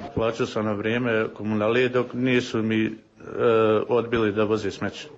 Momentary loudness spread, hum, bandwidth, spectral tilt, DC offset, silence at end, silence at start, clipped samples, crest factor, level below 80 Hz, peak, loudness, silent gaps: 7 LU; none; 8 kHz; -6.5 dB/octave; under 0.1%; 0 s; 0 s; under 0.1%; 14 dB; -54 dBFS; -8 dBFS; -24 LUFS; none